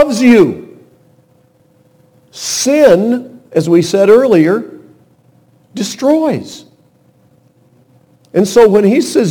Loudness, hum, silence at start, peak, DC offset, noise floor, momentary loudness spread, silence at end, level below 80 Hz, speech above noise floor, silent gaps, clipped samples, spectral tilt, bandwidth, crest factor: -10 LUFS; none; 0 s; 0 dBFS; under 0.1%; -51 dBFS; 14 LU; 0 s; -52 dBFS; 41 dB; none; 0.5%; -5 dB/octave; 19 kHz; 12 dB